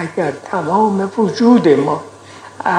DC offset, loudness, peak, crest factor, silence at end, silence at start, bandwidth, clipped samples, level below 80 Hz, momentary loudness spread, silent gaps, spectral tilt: under 0.1%; -15 LUFS; 0 dBFS; 14 dB; 0 s; 0 s; 10 kHz; under 0.1%; -66 dBFS; 11 LU; none; -7 dB/octave